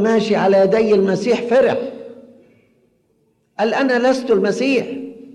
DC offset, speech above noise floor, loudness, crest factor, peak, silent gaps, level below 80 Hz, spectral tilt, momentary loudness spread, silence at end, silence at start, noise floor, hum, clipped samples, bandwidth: under 0.1%; 47 dB; -16 LUFS; 12 dB; -6 dBFS; none; -58 dBFS; -6 dB/octave; 15 LU; 0.05 s; 0 s; -62 dBFS; none; under 0.1%; 11 kHz